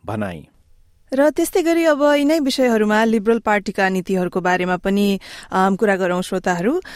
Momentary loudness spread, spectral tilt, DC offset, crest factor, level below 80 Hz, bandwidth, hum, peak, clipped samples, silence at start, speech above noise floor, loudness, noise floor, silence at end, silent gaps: 8 LU; -5.5 dB/octave; under 0.1%; 14 dB; -50 dBFS; 16 kHz; none; -4 dBFS; under 0.1%; 0.05 s; 34 dB; -18 LUFS; -51 dBFS; 0 s; none